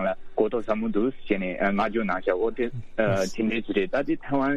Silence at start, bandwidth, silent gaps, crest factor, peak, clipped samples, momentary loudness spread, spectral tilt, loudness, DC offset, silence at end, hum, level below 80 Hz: 0 s; 12 kHz; none; 16 dB; -8 dBFS; under 0.1%; 3 LU; -6.5 dB/octave; -26 LUFS; under 0.1%; 0 s; none; -44 dBFS